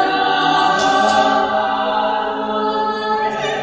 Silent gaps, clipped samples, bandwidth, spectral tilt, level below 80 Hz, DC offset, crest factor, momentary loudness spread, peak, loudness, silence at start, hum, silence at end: none; under 0.1%; 8 kHz; -3.5 dB/octave; -52 dBFS; under 0.1%; 14 dB; 6 LU; -2 dBFS; -16 LUFS; 0 s; none; 0 s